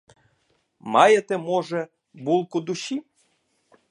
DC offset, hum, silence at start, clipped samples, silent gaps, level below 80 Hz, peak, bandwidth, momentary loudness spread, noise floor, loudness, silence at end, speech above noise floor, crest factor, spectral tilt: under 0.1%; none; 0.85 s; under 0.1%; none; -76 dBFS; -2 dBFS; 11 kHz; 17 LU; -69 dBFS; -22 LUFS; 0.9 s; 47 dB; 22 dB; -4.5 dB/octave